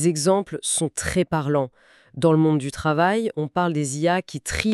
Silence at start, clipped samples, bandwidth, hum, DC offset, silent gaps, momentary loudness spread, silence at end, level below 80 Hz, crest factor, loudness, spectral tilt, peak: 0 s; under 0.1%; 13.5 kHz; none; under 0.1%; none; 6 LU; 0 s; -46 dBFS; 18 dB; -22 LUFS; -5 dB/octave; -4 dBFS